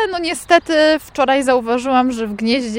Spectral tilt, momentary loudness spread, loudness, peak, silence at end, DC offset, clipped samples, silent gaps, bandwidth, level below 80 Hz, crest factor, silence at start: -3.5 dB/octave; 6 LU; -16 LUFS; 0 dBFS; 0 s; under 0.1%; under 0.1%; none; 16.5 kHz; -48 dBFS; 16 dB; 0 s